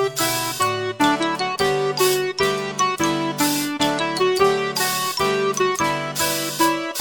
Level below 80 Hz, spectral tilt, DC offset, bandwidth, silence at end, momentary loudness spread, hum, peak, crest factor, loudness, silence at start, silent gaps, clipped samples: -54 dBFS; -3 dB/octave; 0.1%; 17.5 kHz; 0 s; 3 LU; none; -4 dBFS; 16 dB; -20 LUFS; 0 s; none; under 0.1%